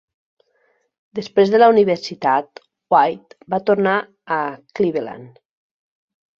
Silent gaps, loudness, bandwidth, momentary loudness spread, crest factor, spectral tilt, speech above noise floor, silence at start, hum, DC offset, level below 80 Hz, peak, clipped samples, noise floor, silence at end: none; -18 LUFS; 7.2 kHz; 19 LU; 18 dB; -6.5 dB/octave; 47 dB; 1.15 s; none; under 0.1%; -64 dBFS; -2 dBFS; under 0.1%; -64 dBFS; 1.1 s